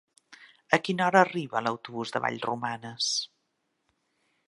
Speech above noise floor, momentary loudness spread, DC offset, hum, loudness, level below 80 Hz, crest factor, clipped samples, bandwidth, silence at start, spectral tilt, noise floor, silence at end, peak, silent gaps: 50 dB; 11 LU; under 0.1%; none; -28 LUFS; -76 dBFS; 28 dB; under 0.1%; 11.5 kHz; 0.3 s; -3.5 dB/octave; -77 dBFS; 1.25 s; -2 dBFS; none